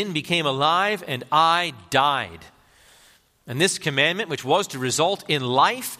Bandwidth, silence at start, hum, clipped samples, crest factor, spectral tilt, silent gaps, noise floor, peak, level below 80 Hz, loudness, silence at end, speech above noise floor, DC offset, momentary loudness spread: 15.5 kHz; 0 s; none; under 0.1%; 20 dB; -3 dB/octave; none; -56 dBFS; -4 dBFS; -64 dBFS; -21 LUFS; 0.05 s; 34 dB; under 0.1%; 6 LU